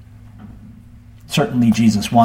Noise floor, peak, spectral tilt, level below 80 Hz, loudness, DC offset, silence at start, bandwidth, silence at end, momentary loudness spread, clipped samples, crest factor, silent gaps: -41 dBFS; 0 dBFS; -6 dB/octave; -44 dBFS; -16 LUFS; under 0.1%; 0.4 s; 16 kHz; 0 s; 25 LU; under 0.1%; 16 dB; none